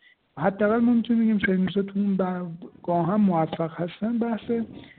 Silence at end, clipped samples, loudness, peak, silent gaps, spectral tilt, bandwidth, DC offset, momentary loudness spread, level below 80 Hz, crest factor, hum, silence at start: 0.15 s; under 0.1%; -24 LUFS; -10 dBFS; none; -6.5 dB/octave; 4.3 kHz; under 0.1%; 8 LU; -60 dBFS; 14 dB; none; 0.35 s